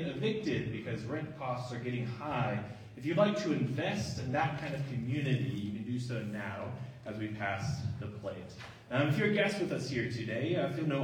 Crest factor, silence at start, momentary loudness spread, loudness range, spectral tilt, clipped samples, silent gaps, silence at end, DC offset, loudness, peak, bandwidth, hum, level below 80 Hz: 20 dB; 0 s; 11 LU; 4 LU; -6.5 dB/octave; under 0.1%; none; 0 s; under 0.1%; -35 LUFS; -16 dBFS; 14 kHz; none; -64 dBFS